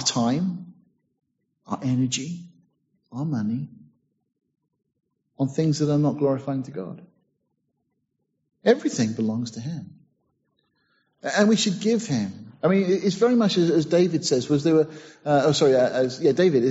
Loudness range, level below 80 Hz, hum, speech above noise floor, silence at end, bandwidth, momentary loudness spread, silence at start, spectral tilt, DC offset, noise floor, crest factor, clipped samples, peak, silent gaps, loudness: 9 LU; -66 dBFS; none; 54 dB; 0 s; 8 kHz; 15 LU; 0 s; -5.5 dB/octave; under 0.1%; -76 dBFS; 18 dB; under 0.1%; -4 dBFS; none; -23 LUFS